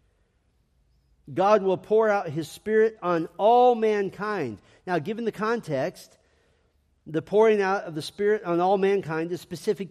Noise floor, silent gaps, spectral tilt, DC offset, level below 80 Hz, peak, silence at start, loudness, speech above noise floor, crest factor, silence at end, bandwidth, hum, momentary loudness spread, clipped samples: -68 dBFS; none; -6 dB/octave; under 0.1%; -66 dBFS; -6 dBFS; 1.3 s; -24 LUFS; 44 dB; 18 dB; 0 s; 13.5 kHz; none; 12 LU; under 0.1%